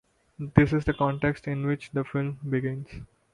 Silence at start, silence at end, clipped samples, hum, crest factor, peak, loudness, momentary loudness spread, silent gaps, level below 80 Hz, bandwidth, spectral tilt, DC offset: 0.4 s; 0.3 s; under 0.1%; none; 24 dB; -2 dBFS; -27 LUFS; 16 LU; none; -46 dBFS; 10.5 kHz; -8.5 dB/octave; under 0.1%